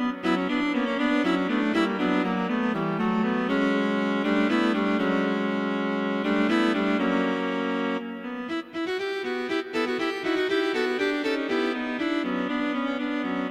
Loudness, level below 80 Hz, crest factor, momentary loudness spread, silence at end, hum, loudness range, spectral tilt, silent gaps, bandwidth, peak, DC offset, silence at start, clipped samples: -26 LUFS; -60 dBFS; 14 dB; 5 LU; 0 s; none; 3 LU; -6 dB/octave; none; 12 kHz; -12 dBFS; under 0.1%; 0 s; under 0.1%